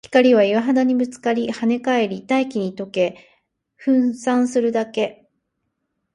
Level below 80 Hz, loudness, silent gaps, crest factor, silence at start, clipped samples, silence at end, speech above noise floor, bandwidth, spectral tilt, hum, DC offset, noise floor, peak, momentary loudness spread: -66 dBFS; -20 LUFS; none; 18 dB; 0.1 s; under 0.1%; 1 s; 56 dB; 10 kHz; -5.5 dB/octave; none; under 0.1%; -75 dBFS; -2 dBFS; 9 LU